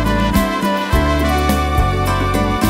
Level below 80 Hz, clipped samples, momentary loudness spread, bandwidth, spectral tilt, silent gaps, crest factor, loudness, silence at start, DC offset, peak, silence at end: -22 dBFS; under 0.1%; 2 LU; 16.5 kHz; -5.5 dB/octave; none; 14 dB; -16 LUFS; 0 s; under 0.1%; 0 dBFS; 0 s